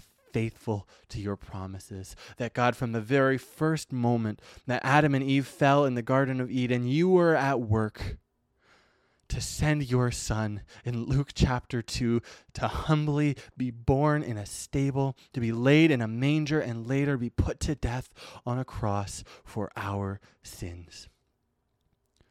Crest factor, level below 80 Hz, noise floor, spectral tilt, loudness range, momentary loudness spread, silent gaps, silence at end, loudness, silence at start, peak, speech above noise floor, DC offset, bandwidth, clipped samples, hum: 22 dB; -46 dBFS; -76 dBFS; -6.5 dB/octave; 8 LU; 17 LU; none; 1.25 s; -28 LUFS; 0.35 s; -8 dBFS; 48 dB; under 0.1%; 14.5 kHz; under 0.1%; none